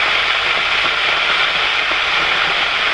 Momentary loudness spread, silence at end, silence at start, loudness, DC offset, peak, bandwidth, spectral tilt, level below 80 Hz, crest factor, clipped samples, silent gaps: 1 LU; 0 s; 0 s; -14 LUFS; under 0.1%; -2 dBFS; 11.5 kHz; -1 dB/octave; -46 dBFS; 14 dB; under 0.1%; none